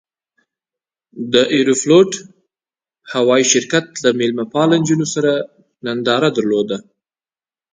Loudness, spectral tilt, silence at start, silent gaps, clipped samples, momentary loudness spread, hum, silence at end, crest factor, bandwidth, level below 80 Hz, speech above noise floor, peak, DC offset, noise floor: -15 LUFS; -4 dB/octave; 1.15 s; none; under 0.1%; 12 LU; none; 0.95 s; 16 dB; 9.6 kHz; -62 dBFS; over 75 dB; 0 dBFS; under 0.1%; under -90 dBFS